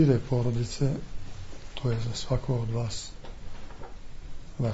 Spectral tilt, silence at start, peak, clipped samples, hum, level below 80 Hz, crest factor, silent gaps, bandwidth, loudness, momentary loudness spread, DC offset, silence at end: -6.5 dB/octave; 0 s; -10 dBFS; under 0.1%; none; -40 dBFS; 18 dB; none; 8 kHz; -30 LUFS; 19 LU; under 0.1%; 0 s